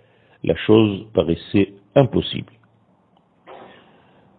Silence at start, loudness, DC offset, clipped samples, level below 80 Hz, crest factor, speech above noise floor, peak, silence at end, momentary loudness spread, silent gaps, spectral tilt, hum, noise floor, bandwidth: 0.45 s; -19 LUFS; under 0.1%; under 0.1%; -48 dBFS; 22 dB; 41 dB; 0 dBFS; 0.75 s; 11 LU; none; -10.5 dB/octave; none; -59 dBFS; 4.5 kHz